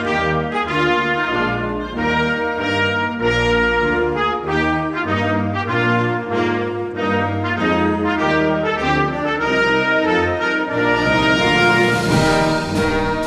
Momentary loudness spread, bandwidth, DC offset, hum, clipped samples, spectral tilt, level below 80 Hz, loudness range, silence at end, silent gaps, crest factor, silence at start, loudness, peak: 5 LU; 13.5 kHz; under 0.1%; none; under 0.1%; -5.5 dB/octave; -38 dBFS; 3 LU; 0 s; none; 14 dB; 0 s; -17 LUFS; -2 dBFS